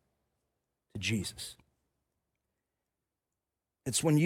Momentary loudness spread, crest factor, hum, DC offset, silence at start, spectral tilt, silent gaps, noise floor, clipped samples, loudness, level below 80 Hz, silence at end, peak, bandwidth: 15 LU; 20 dB; none; under 0.1%; 0.95 s; -4.5 dB/octave; none; -89 dBFS; under 0.1%; -34 LUFS; -68 dBFS; 0 s; -16 dBFS; 16.5 kHz